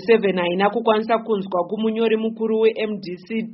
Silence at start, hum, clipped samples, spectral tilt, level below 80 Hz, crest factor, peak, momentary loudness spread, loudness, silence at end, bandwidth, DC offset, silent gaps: 0 s; none; under 0.1%; -4 dB/octave; -68 dBFS; 18 dB; -2 dBFS; 8 LU; -21 LUFS; 0 s; 5.8 kHz; under 0.1%; none